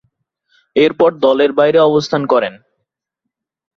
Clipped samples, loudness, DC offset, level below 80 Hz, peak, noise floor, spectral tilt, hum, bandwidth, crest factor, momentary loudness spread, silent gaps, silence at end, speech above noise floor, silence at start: under 0.1%; -13 LUFS; under 0.1%; -60 dBFS; 0 dBFS; -78 dBFS; -6 dB/octave; none; 7.2 kHz; 14 dB; 5 LU; none; 1.25 s; 66 dB; 0.75 s